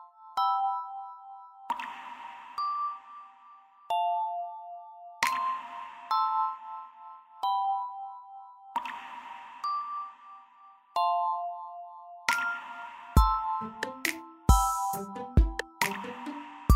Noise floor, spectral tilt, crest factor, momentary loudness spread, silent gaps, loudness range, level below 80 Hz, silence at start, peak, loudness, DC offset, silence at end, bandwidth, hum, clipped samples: -57 dBFS; -4.5 dB/octave; 24 dB; 19 LU; none; 7 LU; -38 dBFS; 0 s; -8 dBFS; -31 LUFS; under 0.1%; 0 s; 16 kHz; none; under 0.1%